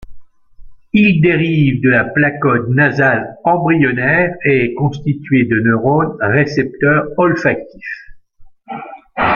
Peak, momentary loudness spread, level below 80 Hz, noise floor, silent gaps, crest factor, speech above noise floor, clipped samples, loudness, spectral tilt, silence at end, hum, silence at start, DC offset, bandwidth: -2 dBFS; 15 LU; -44 dBFS; -40 dBFS; none; 14 dB; 27 dB; under 0.1%; -13 LUFS; -8.5 dB/octave; 0 s; none; 0 s; under 0.1%; 7 kHz